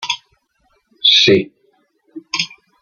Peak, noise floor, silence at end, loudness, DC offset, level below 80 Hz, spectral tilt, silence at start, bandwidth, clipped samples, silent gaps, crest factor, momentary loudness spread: 0 dBFS; -62 dBFS; 0.35 s; -14 LUFS; under 0.1%; -60 dBFS; -3 dB/octave; 0 s; 7.2 kHz; under 0.1%; none; 18 dB; 16 LU